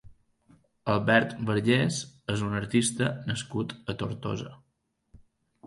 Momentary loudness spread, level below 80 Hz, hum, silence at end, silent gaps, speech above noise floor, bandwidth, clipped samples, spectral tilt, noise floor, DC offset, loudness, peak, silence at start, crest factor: 11 LU; -58 dBFS; none; 0 s; none; 48 dB; 11.5 kHz; under 0.1%; -5 dB/octave; -75 dBFS; under 0.1%; -28 LUFS; -6 dBFS; 0.05 s; 24 dB